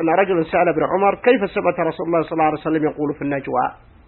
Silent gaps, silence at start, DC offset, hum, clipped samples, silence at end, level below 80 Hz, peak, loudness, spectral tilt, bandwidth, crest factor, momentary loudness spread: none; 0 s; under 0.1%; none; under 0.1%; 0.3 s; -50 dBFS; -2 dBFS; -19 LUFS; -11.5 dB/octave; 4.2 kHz; 18 dB; 6 LU